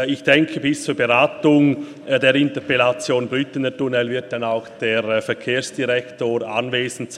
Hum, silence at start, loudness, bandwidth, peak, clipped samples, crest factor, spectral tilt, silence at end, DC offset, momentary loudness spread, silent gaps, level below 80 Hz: none; 0 s; -19 LUFS; 12 kHz; 0 dBFS; under 0.1%; 18 dB; -5 dB/octave; 0 s; under 0.1%; 8 LU; none; -64 dBFS